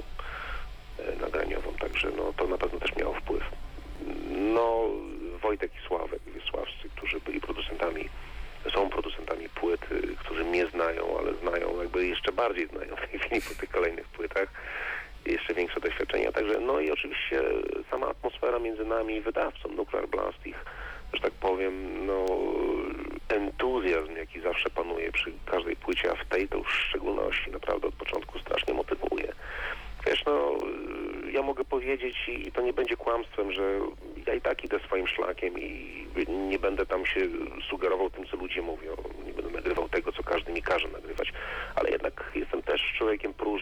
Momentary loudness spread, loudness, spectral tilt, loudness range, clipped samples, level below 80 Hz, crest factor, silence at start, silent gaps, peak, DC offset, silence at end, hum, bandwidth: 9 LU; -31 LUFS; -5 dB/octave; 3 LU; under 0.1%; -44 dBFS; 14 dB; 0 s; none; -18 dBFS; under 0.1%; 0 s; none; 17.5 kHz